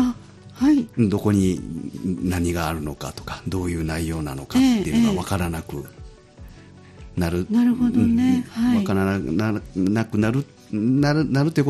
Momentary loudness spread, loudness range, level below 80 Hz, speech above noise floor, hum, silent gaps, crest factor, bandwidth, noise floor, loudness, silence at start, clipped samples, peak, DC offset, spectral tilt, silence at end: 12 LU; 3 LU; -42 dBFS; 23 dB; none; none; 16 dB; 13.5 kHz; -44 dBFS; -22 LUFS; 0 s; under 0.1%; -6 dBFS; under 0.1%; -6.5 dB/octave; 0 s